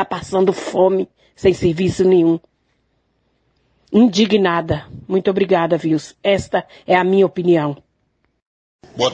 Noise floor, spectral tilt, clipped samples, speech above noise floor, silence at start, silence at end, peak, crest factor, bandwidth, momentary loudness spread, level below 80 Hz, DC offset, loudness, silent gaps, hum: -66 dBFS; -6 dB/octave; under 0.1%; 50 dB; 0 s; 0 s; -2 dBFS; 16 dB; 9.2 kHz; 10 LU; -48 dBFS; under 0.1%; -17 LUFS; 8.42-8.79 s; none